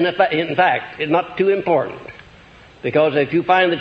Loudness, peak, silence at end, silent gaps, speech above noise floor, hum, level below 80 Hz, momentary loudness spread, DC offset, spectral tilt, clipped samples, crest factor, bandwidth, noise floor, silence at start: -18 LUFS; 0 dBFS; 0 s; none; 27 dB; none; -56 dBFS; 12 LU; under 0.1%; -7.5 dB/octave; under 0.1%; 18 dB; 6.4 kHz; -45 dBFS; 0 s